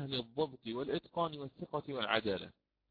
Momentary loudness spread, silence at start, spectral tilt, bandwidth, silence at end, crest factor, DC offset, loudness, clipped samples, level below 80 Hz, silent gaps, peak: 8 LU; 0 s; -3 dB/octave; 5 kHz; 0.4 s; 24 dB; under 0.1%; -38 LUFS; under 0.1%; -70 dBFS; none; -16 dBFS